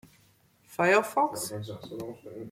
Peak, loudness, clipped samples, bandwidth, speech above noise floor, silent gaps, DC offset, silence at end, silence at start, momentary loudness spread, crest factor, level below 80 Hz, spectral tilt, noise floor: -10 dBFS; -27 LUFS; under 0.1%; 16.5 kHz; 35 dB; none; under 0.1%; 0 s; 0.7 s; 18 LU; 20 dB; -70 dBFS; -4 dB/octave; -64 dBFS